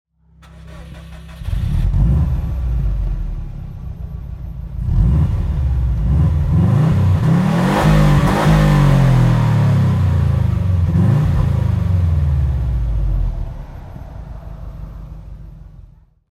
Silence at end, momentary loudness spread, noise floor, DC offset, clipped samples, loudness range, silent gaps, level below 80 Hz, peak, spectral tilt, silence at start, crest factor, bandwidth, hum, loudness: 0.55 s; 21 LU; -45 dBFS; under 0.1%; under 0.1%; 9 LU; none; -22 dBFS; -2 dBFS; -8 dB/octave; 0.55 s; 14 dB; 14 kHz; none; -16 LUFS